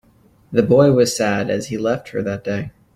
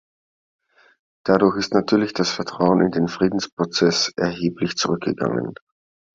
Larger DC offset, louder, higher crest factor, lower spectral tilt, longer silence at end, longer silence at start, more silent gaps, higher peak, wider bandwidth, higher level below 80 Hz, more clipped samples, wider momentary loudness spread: neither; first, -18 LUFS vs -21 LUFS; about the same, 16 dB vs 20 dB; about the same, -5.5 dB/octave vs -5 dB/octave; second, 0.25 s vs 0.6 s; second, 0.5 s vs 1.25 s; second, none vs 3.52-3.57 s; about the same, -2 dBFS vs -2 dBFS; first, 15.5 kHz vs 7.8 kHz; about the same, -52 dBFS vs -56 dBFS; neither; first, 11 LU vs 6 LU